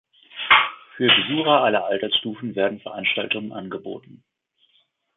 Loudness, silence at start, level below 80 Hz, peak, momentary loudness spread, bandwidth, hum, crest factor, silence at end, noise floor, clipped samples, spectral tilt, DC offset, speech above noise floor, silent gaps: -20 LUFS; 0.35 s; -66 dBFS; -2 dBFS; 17 LU; 4.2 kHz; none; 22 dB; 1 s; -65 dBFS; under 0.1%; -8 dB/octave; under 0.1%; 42 dB; none